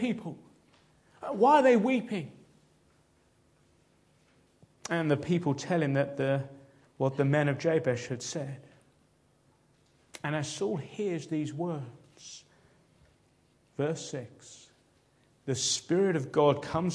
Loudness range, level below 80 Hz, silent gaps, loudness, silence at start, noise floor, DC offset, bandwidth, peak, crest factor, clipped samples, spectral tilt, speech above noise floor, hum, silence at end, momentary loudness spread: 10 LU; -70 dBFS; none; -29 LUFS; 0 s; -67 dBFS; under 0.1%; 11 kHz; -10 dBFS; 22 dB; under 0.1%; -5.5 dB/octave; 38 dB; none; 0 s; 21 LU